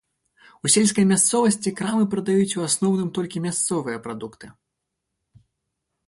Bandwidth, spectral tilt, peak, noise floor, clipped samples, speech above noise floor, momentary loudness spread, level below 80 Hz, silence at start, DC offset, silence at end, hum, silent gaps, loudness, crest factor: 11.5 kHz; -4 dB/octave; -6 dBFS; -80 dBFS; under 0.1%; 59 dB; 13 LU; -62 dBFS; 0.65 s; under 0.1%; 1.55 s; none; none; -21 LUFS; 18 dB